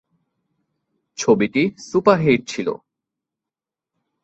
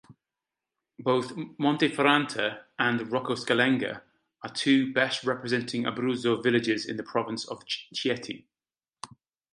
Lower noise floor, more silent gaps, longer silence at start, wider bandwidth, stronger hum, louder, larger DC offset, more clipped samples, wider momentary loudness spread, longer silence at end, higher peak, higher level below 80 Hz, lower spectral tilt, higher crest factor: about the same, -88 dBFS vs under -90 dBFS; neither; first, 1.2 s vs 0.1 s; second, 8.2 kHz vs 11 kHz; neither; first, -19 LUFS vs -27 LUFS; neither; neither; about the same, 12 LU vs 14 LU; first, 1.5 s vs 0.5 s; first, -2 dBFS vs -6 dBFS; first, -58 dBFS vs -74 dBFS; about the same, -5.5 dB/octave vs -4.5 dB/octave; about the same, 20 dB vs 24 dB